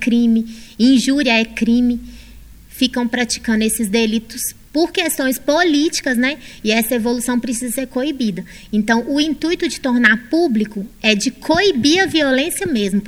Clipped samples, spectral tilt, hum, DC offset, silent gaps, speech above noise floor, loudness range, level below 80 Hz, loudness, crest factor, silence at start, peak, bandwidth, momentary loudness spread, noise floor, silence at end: under 0.1%; -3.5 dB/octave; none; under 0.1%; none; 23 dB; 3 LU; -44 dBFS; -17 LUFS; 16 dB; 0 s; 0 dBFS; 16.5 kHz; 8 LU; -39 dBFS; 0 s